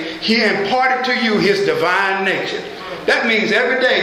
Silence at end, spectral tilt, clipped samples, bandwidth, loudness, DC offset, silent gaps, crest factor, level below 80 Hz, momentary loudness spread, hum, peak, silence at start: 0 s; -4 dB/octave; under 0.1%; 15.5 kHz; -16 LUFS; under 0.1%; none; 16 dB; -56 dBFS; 7 LU; none; -2 dBFS; 0 s